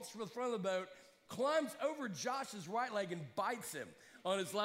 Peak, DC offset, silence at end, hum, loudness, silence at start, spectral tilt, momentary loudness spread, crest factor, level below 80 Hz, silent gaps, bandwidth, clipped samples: -24 dBFS; under 0.1%; 0 s; none; -40 LUFS; 0 s; -4 dB/octave; 10 LU; 18 dB; -86 dBFS; none; 16 kHz; under 0.1%